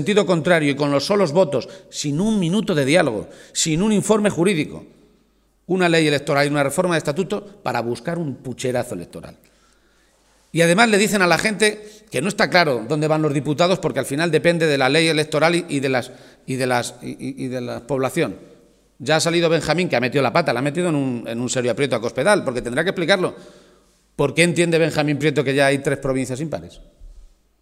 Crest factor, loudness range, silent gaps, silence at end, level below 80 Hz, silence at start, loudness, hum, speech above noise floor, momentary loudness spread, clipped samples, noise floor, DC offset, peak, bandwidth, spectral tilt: 20 dB; 5 LU; none; 0.4 s; -52 dBFS; 0 s; -19 LUFS; none; 41 dB; 11 LU; under 0.1%; -60 dBFS; under 0.1%; 0 dBFS; 16 kHz; -4.5 dB/octave